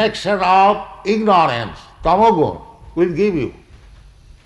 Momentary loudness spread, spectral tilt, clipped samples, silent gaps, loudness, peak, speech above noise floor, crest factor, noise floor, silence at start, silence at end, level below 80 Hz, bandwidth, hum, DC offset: 13 LU; -6 dB/octave; under 0.1%; none; -16 LUFS; -4 dBFS; 28 dB; 14 dB; -43 dBFS; 0 s; 0.95 s; -42 dBFS; 11.5 kHz; none; under 0.1%